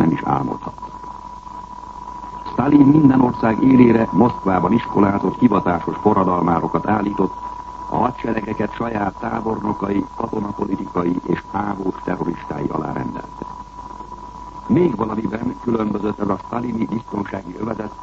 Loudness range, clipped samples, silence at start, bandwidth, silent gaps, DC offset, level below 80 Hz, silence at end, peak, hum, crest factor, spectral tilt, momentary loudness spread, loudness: 9 LU; under 0.1%; 0 s; 7.4 kHz; none; under 0.1%; -44 dBFS; 0 s; 0 dBFS; none; 18 dB; -9 dB/octave; 20 LU; -19 LUFS